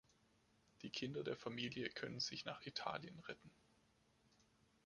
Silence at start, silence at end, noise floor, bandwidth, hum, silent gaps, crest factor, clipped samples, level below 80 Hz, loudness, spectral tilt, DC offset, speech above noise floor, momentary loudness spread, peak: 0.8 s; 1.3 s; -77 dBFS; 11 kHz; none; none; 24 dB; under 0.1%; -80 dBFS; -47 LUFS; -4 dB/octave; under 0.1%; 29 dB; 10 LU; -26 dBFS